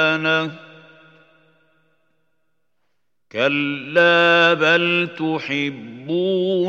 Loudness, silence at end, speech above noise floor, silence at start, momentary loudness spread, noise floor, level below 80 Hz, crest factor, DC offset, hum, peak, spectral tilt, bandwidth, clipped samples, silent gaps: -17 LUFS; 0 s; 58 dB; 0 s; 13 LU; -76 dBFS; -78 dBFS; 20 dB; under 0.1%; 60 Hz at -65 dBFS; -2 dBFS; -5.5 dB/octave; 8 kHz; under 0.1%; none